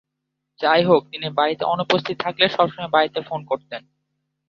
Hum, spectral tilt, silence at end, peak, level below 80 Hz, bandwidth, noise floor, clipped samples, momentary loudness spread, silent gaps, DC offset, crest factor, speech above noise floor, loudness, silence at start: none; -6 dB/octave; 0.7 s; -2 dBFS; -64 dBFS; 7.2 kHz; -79 dBFS; under 0.1%; 10 LU; none; under 0.1%; 20 dB; 59 dB; -20 LUFS; 0.6 s